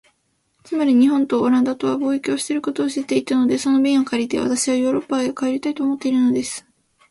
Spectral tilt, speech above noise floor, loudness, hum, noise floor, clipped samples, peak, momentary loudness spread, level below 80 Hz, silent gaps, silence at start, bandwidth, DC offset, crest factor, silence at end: -4 dB/octave; 48 dB; -19 LUFS; none; -67 dBFS; under 0.1%; -6 dBFS; 6 LU; -60 dBFS; none; 0.7 s; 11.5 kHz; under 0.1%; 14 dB; 0.5 s